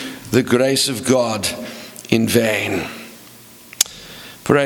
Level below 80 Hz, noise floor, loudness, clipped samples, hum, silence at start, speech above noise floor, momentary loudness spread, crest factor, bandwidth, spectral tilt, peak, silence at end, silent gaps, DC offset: -54 dBFS; -42 dBFS; -18 LUFS; under 0.1%; none; 0 s; 25 dB; 19 LU; 20 dB; over 20 kHz; -4 dB/octave; 0 dBFS; 0 s; none; under 0.1%